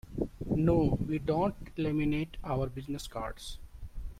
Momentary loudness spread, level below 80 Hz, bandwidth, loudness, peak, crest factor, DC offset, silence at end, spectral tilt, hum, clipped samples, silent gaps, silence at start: 17 LU; -44 dBFS; 15.5 kHz; -32 LUFS; -14 dBFS; 18 dB; under 0.1%; 0 s; -7.5 dB/octave; none; under 0.1%; none; 0.05 s